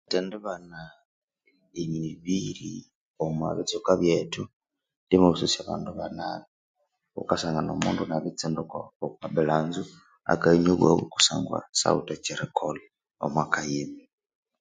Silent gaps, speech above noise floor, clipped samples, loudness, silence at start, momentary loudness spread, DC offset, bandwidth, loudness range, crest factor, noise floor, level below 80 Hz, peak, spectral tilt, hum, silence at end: 1.05-1.28 s, 2.95-3.14 s, 4.53-4.60 s, 4.96-5.07 s, 6.48-6.74 s, 8.96-9.00 s, 11.69-11.73 s; 42 dB; under 0.1%; -27 LUFS; 0.1 s; 17 LU; under 0.1%; 9.6 kHz; 7 LU; 26 dB; -69 dBFS; -56 dBFS; -2 dBFS; -4.5 dB/octave; none; 0.6 s